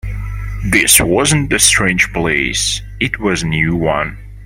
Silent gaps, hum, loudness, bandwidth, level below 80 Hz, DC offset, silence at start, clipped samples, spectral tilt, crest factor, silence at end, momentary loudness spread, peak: none; none; -13 LUFS; over 20 kHz; -28 dBFS; under 0.1%; 0.05 s; under 0.1%; -3 dB/octave; 14 dB; 0 s; 14 LU; 0 dBFS